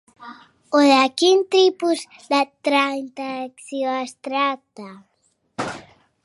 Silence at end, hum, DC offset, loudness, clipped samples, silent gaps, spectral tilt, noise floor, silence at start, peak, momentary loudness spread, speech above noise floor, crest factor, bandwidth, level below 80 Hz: 0.45 s; none; under 0.1%; -20 LUFS; under 0.1%; none; -3 dB/octave; -48 dBFS; 0.2 s; -4 dBFS; 18 LU; 29 dB; 18 dB; 11.5 kHz; -70 dBFS